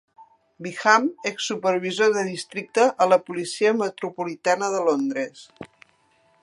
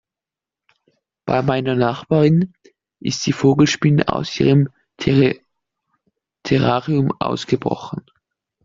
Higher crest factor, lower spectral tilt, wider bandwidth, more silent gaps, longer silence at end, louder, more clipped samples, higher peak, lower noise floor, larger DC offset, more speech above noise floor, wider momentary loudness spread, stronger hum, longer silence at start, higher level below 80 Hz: about the same, 22 dB vs 18 dB; second, -3.5 dB/octave vs -6.5 dB/octave; first, 11.5 kHz vs 7.6 kHz; neither; about the same, 0.75 s vs 0.65 s; second, -22 LUFS vs -18 LUFS; neither; about the same, -2 dBFS vs -2 dBFS; second, -62 dBFS vs -88 dBFS; neither; second, 40 dB vs 71 dB; about the same, 13 LU vs 12 LU; neither; second, 0.2 s vs 1.25 s; second, -74 dBFS vs -50 dBFS